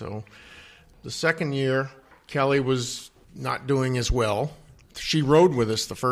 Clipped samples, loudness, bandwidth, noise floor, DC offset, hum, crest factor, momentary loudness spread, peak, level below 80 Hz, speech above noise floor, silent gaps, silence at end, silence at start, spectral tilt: under 0.1%; -24 LUFS; 15.5 kHz; -50 dBFS; under 0.1%; none; 18 dB; 17 LU; -8 dBFS; -42 dBFS; 26 dB; none; 0 s; 0 s; -5 dB/octave